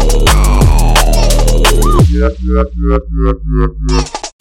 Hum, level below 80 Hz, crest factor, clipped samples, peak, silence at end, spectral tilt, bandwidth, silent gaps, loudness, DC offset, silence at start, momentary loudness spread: none; -10 dBFS; 8 dB; under 0.1%; 0 dBFS; 0.1 s; -5 dB/octave; 16 kHz; none; -12 LUFS; under 0.1%; 0 s; 6 LU